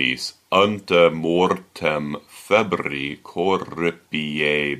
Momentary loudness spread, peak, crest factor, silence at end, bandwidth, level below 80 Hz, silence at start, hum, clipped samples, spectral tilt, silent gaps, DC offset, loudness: 10 LU; -2 dBFS; 18 dB; 0 s; 14.5 kHz; -56 dBFS; 0 s; none; under 0.1%; -5 dB/octave; none; under 0.1%; -21 LUFS